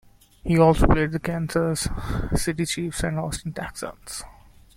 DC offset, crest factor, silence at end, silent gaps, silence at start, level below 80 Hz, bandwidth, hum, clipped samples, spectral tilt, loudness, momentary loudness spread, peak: under 0.1%; 22 dB; 0.45 s; none; 0.45 s; -32 dBFS; 16 kHz; none; under 0.1%; -5.5 dB/octave; -24 LUFS; 17 LU; -2 dBFS